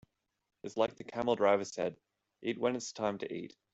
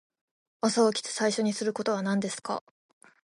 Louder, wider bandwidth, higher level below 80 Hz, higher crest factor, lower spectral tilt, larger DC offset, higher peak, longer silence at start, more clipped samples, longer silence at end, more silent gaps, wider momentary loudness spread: second, -35 LUFS vs -28 LUFS; second, 8.2 kHz vs 11.5 kHz; about the same, -76 dBFS vs -78 dBFS; about the same, 22 dB vs 18 dB; about the same, -4.5 dB/octave vs -4 dB/octave; neither; about the same, -14 dBFS vs -12 dBFS; about the same, 0.65 s vs 0.65 s; neither; second, 0.25 s vs 0.65 s; neither; first, 13 LU vs 9 LU